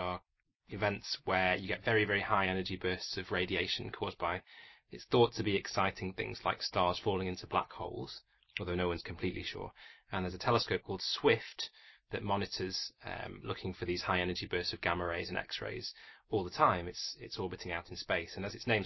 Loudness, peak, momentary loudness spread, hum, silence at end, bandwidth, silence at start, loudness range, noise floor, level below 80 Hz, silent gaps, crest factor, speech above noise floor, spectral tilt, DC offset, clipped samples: -35 LUFS; -12 dBFS; 13 LU; none; 0 s; 6.2 kHz; 0 s; 4 LU; -74 dBFS; -56 dBFS; none; 24 dB; 39 dB; -5 dB/octave; under 0.1%; under 0.1%